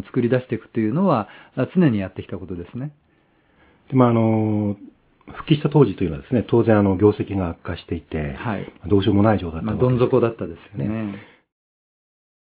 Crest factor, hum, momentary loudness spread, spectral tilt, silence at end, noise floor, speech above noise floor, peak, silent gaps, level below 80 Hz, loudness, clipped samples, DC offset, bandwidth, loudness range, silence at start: 20 dB; none; 15 LU; -12 dB/octave; 1.35 s; -60 dBFS; 40 dB; 0 dBFS; none; -42 dBFS; -20 LUFS; under 0.1%; under 0.1%; 4 kHz; 4 LU; 0.05 s